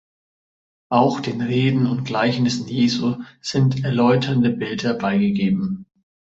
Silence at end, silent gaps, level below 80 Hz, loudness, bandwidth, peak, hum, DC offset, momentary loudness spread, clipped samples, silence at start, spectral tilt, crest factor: 0.55 s; none; -56 dBFS; -20 LUFS; 8 kHz; -2 dBFS; none; under 0.1%; 7 LU; under 0.1%; 0.9 s; -6.5 dB/octave; 18 dB